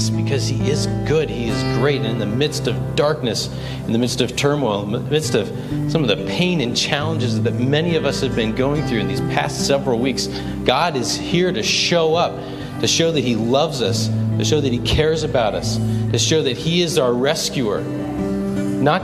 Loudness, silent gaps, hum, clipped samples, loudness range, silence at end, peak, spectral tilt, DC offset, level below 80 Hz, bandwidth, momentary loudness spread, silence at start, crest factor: -19 LUFS; none; none; under 0.1%; 2 LU; 0 s; 0 dBFS; -5 dB/octave; under 0.1%; -40 dBFS; 15 kHz; 5 LU; 0 s; 18 dB